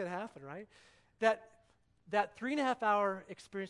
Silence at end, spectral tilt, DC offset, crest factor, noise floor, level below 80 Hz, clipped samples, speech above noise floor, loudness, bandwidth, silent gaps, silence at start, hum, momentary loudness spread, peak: 0 s; -5 dB/octave; under 0.1%; 22 dB; -70 dBFS; -78 dBFS; under 0.1%; 35 dB; -35 LUFS; 11.5 kHz; none; 0 s; 60 Hz at -80 dBFS; 16 LU; -14 dBFS